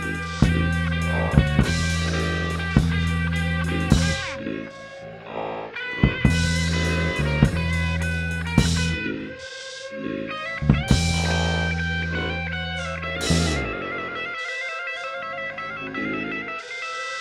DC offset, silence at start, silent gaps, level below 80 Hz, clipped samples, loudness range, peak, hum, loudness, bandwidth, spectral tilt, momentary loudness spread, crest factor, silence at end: under 0.1%; 0 s; none; -32 dBFS; under 0.1%; 4 LU; -2 dBFS; none; -24 LUFS; 13 kHz; -5 dB/octave; 10 LU; 22 dB; 0 s